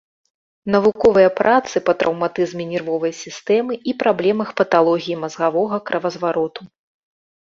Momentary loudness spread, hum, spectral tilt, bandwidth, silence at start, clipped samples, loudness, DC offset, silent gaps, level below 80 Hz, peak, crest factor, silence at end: 10 LU; none; -5.5 dB/octave; 7.6 kHz; 0.65 s; under 0.1%; -18 LUFS; under 0.1%; none; -56 dBFS; -2 dBFS; 16 dB; 0.9 s